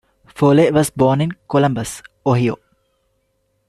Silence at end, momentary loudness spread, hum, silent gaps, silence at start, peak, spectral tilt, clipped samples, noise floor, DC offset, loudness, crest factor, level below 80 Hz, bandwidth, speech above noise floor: 1.15 s; 11 LU; none; none; 0.35 s; -2 dBFS; -6.5 dB/octave; under 0.1%; -66 dBFS; under 0.1%; -17 LUFS; 16 dB; -50 dBFS; 13.5 kHz; 51 dB